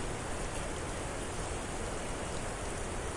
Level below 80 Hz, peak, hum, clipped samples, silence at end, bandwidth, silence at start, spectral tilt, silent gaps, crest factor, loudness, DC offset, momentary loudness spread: -44 dBFS; -24 dBFS; none; under 0.1%; 0 s; 11.5 kHz; 0 s; -4 dB/octave; none; 12 dB; -38 LUFS; under 0.1%; 0 LU